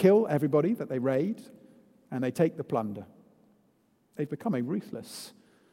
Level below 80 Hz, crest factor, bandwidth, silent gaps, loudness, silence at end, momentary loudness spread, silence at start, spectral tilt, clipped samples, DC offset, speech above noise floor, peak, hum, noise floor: -76 dBFS; 20 dB; 16 kHz; none; -30 LUFS; 0.45 s; 17 LU; 0 s; -7.5 dB/octave; under 0.1%; under 0.1%; 40 dB; -10 dBFS; none; -68 dBFS